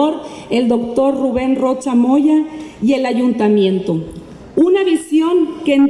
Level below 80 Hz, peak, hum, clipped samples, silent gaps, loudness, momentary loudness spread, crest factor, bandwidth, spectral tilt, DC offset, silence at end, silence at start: -48 dBFS; -4 dBFS; none; under 0.1%; none; -15 LUFS; 9 LU; 10 dB; 11.5 kHz; -6.5 dB/octave; under 0.1%; 0 s; 0 s